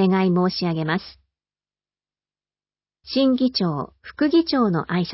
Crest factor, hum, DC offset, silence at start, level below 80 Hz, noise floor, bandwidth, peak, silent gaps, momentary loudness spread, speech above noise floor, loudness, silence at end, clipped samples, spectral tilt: 14 dB; 50 Hz at -60 dBFS; under 0.1%; 0 s; -58 dBFS; under -90 dBFS; 5.8 kHz; -8 dBFS; none; 8 LU; over 69 dB; -21 LUFS; 0 s; under 0.1%; -10 dB/octave